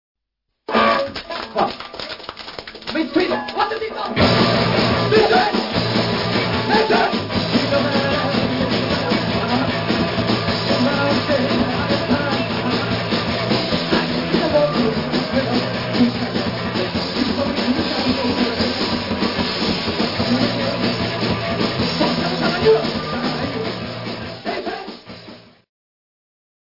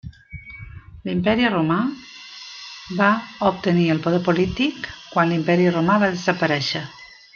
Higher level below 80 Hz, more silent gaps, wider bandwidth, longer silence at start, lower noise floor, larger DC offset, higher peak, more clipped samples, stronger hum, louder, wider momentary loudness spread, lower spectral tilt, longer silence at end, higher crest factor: about the same, -46 dBFS vs -50 dBFS; neither; second, 5.8 kHz vs 7 kHz; first, 0.7 s vs 0.05 s; first, -77 dBFS vs -39 dBFS; first, 0.1% vs under 0.1%; about the same, -2 dBFS vs -2 dBFS; neither; neither; about the same, -19 LUFS vs -20 LUFS; second, 10 LU vs 19 LU; about the same, -6 dB/octave vs -6.5 dB/octave; first, 1.35 s vs 0.2 s; about the same, 18 dB vs 18 dB